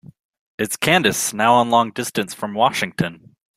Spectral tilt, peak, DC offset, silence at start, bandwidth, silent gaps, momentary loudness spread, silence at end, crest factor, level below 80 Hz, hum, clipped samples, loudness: -3.5 dB/octave; -2 dBFS; under 0.1%; 0.6 s; 16 kHz; none; 10 LU; 0.4 s; 18 dB; -58 dBFS; none; under 0.1%; -19 LUFS